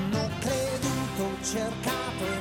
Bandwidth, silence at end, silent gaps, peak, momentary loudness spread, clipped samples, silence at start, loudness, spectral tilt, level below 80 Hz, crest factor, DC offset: 17 kHz; 0 s; none; -16 dBFS; 2 LU; under 0.1%; 0 s; -30 LUFS; -4.5 dB/octave; -48 dBFS; 14 dB; under 0.1%